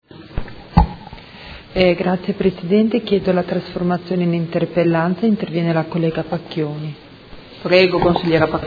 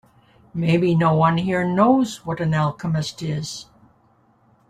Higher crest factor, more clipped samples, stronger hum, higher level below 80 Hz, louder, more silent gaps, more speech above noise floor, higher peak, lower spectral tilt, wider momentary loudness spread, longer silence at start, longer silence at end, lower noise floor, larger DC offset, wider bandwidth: about the same, 18 dB vs 16 dB; neither; neither; first, -32 dBFS vs -54 dBFS; about the same, -18 LUFS vs -20 LUFS; neither; second, 22 dB vs 39 dB; first, 0 dBFS vs -4 dBFS; first, -9 dB/octave vs -6.5 dB/octave; first, 16 LU vs 11 LU; second, 0.15 s vs 0.55 s; second, 0 s vs 1.05 s; second, -39 dBFS vs -59 dBFS; neither; second, 5 kHz vs 10.5 kHz